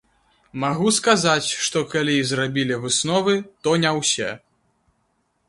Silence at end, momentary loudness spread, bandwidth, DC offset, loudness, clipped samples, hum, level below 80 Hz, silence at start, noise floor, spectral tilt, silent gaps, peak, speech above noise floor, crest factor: 1.1 s; 8 LU; 11.5 kHz; under 0.1%; -20 LUFS; under 0.1%; none; -60 dBFS; 0.55 s; -69 dBFS; -3.5 dB/octave; none; -2 dBFS; 48 dB; 22 dB